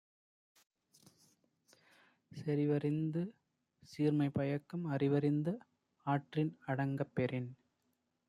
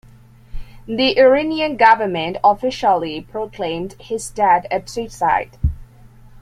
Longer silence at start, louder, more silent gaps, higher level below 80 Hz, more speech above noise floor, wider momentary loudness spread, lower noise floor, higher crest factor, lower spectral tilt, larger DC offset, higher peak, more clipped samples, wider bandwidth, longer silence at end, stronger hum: first, 2.3 s vs 0.55 s; second, -37 LUFS vs -18 LUFS; neither; second, -76 dBFS vs -36 dBFS; first, 47 dB vs 28 dB; about the same, 12 LU vs 14 LU; first, -82 dBFS vs -45 dBFS; about the same, 18 dB vs 18 dB; first, -9 dB/octave vs -5 dB/octave; neither; second, -22 dBFS vs -2 dBFS; neither; second, 10.5 kHz vs 13.5 kHz; first, 0.75 s vs 0.55 s; neither